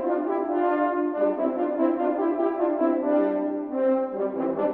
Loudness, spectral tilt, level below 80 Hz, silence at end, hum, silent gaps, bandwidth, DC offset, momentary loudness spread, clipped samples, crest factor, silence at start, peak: -25 LUFS; -10 dB/octave; -68 dBFS; 0 s; none; none; 4.1 kHz; under 0.1%; 3 LU; under 0.1%; 14 dB; 0 s; -10 dBFS